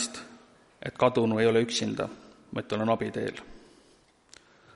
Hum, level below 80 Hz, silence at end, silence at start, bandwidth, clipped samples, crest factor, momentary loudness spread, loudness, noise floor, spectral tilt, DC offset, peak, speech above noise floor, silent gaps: none; -62 dBFS; 1.15 s; 0 s; 11.5 kHz; under 0.1%; 22 dB; 19 LU; -28 LUFS; -62 dBFS; -4.5 dB/octave; under 0.1%; -8 dBFS; 34 dB; none